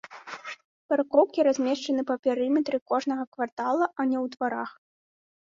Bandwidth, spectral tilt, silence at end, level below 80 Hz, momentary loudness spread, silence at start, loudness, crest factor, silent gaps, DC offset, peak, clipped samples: 7.6 kHz; -4 dB/octave; 0.85 s; -74 dBFS; 16 LU; 0.1 s; -26 LUFS; 20 dB; 0.64-0.89 s, 2.19-2.23 s, 2.81-2.86 s, 3.27-3.32 s, 3.52-3.57 s; under 0.1%; -8 dBFS; under 0.1%